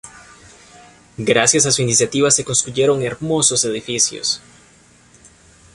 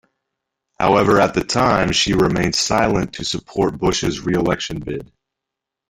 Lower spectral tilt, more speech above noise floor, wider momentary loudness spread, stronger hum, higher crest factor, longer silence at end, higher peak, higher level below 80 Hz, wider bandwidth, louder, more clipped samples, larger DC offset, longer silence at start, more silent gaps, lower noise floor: second, -2.5 dB/octave vs -4.5 dB/octave; second, 33 dB vs 66 dB; about the same, 8 LU vs 9 LU; neither; about the same, 18 dB vs 18 dB; first, 1.35 s vs 0.85 s; about the same, 0 dBFS vs -2 dBFS; second, -52 dBFS vs -40 dBFS; second, 11.5 kHz vs 16 kHz; about the same, -16 LUFS vs -18 LUFS; neither; neither; second, 0.05 s vs 0.8 s; neither; second, -50 dBFS vs -83 dBFS